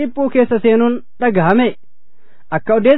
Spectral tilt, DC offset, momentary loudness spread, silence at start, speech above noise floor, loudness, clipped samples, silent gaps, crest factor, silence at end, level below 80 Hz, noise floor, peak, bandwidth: -10.5 dB/octave; 4%; 6 LU; 0 s; 46 dB; -15 LUFS; under 0.1%; none; 14 dB; 0 s; -50 dBFS; -59 dBFS; 0 dBFS; 4.1 kHz